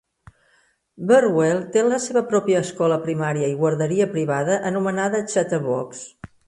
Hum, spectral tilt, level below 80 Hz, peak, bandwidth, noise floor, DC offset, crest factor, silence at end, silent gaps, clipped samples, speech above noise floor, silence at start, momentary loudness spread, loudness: none; -5.5 dB/octave; -62 dBFS; -4 dBFS; 11.5 kHz; -62 dBFS; under 0.1%; 16 dB; 0.2 s; none; under 0.1%; 42 dB; 1 s; 8 LU; -21 LUFS